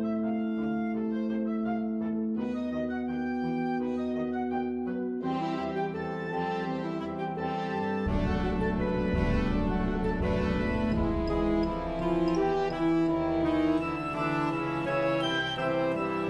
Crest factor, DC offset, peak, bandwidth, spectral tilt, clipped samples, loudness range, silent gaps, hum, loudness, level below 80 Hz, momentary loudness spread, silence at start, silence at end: 14 dB; under 0.1%; -14 dBFS; 10 kHz; -7.5 dB/octave; under 0.1%; 4 LU; none; none; -30 LUFS; -40 dBFS; 5 LU; 0 s; 0 s